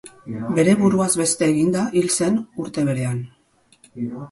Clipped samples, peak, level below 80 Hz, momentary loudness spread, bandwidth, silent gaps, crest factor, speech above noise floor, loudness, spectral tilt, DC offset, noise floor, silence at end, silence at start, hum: under 0.1%; -4 dBFS; -58 dBFS; 14 LU; 12 kHz; none; 16 dB; 35 dB; -20 LUFS; -5 dB/octave; under 0.1%; -55 dBFS; 0.05 s; 0.05 s; none